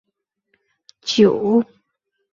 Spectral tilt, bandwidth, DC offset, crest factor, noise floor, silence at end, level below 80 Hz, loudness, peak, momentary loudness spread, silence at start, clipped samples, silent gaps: -5.5 dB/octave; 7.6 kHz; under 0.1%; 18 dB; -75 dBFS; 0.7 s; -62 dBFS; -17 LUFS; -2 dBFS; 16 LU; 1.05 s; under 0.1%; none